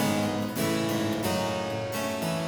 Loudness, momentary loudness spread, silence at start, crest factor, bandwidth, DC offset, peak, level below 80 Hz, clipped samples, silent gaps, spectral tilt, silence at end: -28 LUFS; 4 LU; 0 s; 14 dB; over 20 kHz; under 0.1%; -14 dBFS; -58 dBFS; under 0.1%; none; -5 dB/octave; 0 s